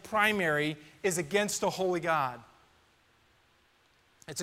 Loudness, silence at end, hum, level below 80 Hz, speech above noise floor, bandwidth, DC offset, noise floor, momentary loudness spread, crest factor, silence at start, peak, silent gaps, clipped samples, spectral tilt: -30 LUFS; 0 s; none; -70 dBFS; 37 dB; 16 kHz; under 0.1%; -67 dBFS; 9 LU; 22 dB; 0.05 s; -10 dBFS; none; under 0.1%; -3.5 dB/octave